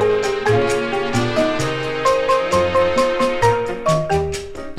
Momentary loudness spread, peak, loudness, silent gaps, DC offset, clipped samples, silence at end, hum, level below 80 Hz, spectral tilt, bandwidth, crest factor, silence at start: 5 LU; -4 dBFS; -18 LUFS; none; under 0.1%; under 0.1%; 0 s; none; -38 dBFS; -5 dB/octave; 14.5 kHz; 14 dB; 0 s